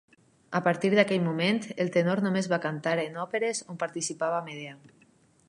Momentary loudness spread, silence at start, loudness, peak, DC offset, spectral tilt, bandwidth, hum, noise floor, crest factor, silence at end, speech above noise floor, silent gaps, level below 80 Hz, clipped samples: 9 LU; 0.5 s; -28 LUFS; -8 dBFS; under 0.1%; -5 dB/octave; 11.5 kHz; none; -62 dBFS; 22 dB; 0.75 s; 35 dB; none; -76 dBFS; under 0.1%